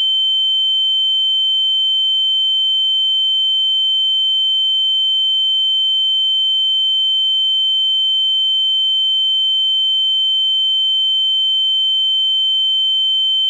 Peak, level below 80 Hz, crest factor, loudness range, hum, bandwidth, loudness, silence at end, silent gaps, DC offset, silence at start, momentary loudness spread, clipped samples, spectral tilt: -12 dBFS; under -90 dBFS; 4 dB; 0 LU; none; 11.5 kHz; -12 LUFS; 0 s; none; under 0.1%; 0 s; 0 LU; under 0.1%; 11 dB/octave